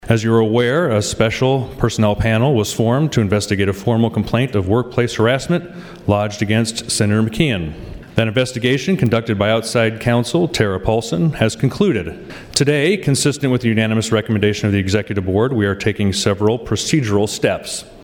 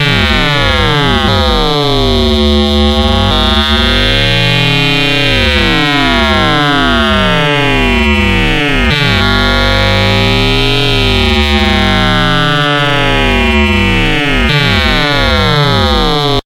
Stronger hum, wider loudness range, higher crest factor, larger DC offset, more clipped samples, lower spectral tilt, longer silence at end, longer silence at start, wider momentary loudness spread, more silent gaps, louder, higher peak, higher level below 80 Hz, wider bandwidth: neither; about the same, 2 LU vs 1 LU; first, 16 dB vs 8 dB; neither; neither; about the same, -5.5 dB/octave vs -5 dB/octave; about the same, 0 s vs 0.05 s; about the same, 0.05 s vs 0 s; first, 4 LU vs 1 LU; neither; second, -17 LUFS vs -9 LUFS; about the same, 0 dBFS vs 0 dBFS; second, -40 dBFS vs -18 dBFS; about the same, 17.5 kHz vs 17 kHz